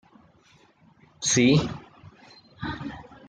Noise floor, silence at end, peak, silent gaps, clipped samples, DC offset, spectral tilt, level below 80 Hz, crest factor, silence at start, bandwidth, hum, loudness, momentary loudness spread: -59 dBFS; 0.15 s; -8 dBFS; none; under 0.1%; under 0.1%; -4 dB/octave; -54 dBFS; 20 dB; 1.2 s; 10 kHz; none; -24 LUFS; 19 LU